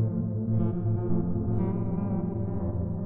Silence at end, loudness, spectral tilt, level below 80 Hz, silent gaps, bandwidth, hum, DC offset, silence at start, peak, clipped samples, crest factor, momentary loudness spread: 0 s; -29 LUFS; -13.5 dB/octave; -42 dBFS; none; 2.4 kHz; none; under 0.1%; 0 s; -14 dBFS; under 0.1%; 12 dB; 3 LU